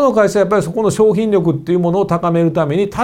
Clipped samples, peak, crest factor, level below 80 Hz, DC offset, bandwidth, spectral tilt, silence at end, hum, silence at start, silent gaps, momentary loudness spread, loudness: under 0.1%; -2 dBFS; 12 dB; -46 dBFS; under 0.1%; 15 kHz; -7 dB/octave; 0 s; none; 0 s; none; 4 LU; -14 LUFS